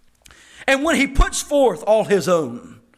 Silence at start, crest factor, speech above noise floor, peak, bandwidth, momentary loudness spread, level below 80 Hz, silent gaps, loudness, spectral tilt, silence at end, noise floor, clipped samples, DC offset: 0.6 s; 14 dB; 32 dB; -6 dBFS; 15.5 kHz; 9 LU; -28 dBFS; none; -18 LUFS; -4 dB/octave; 0.25 s; -49 dBFS; under 0.1%; under 0.1%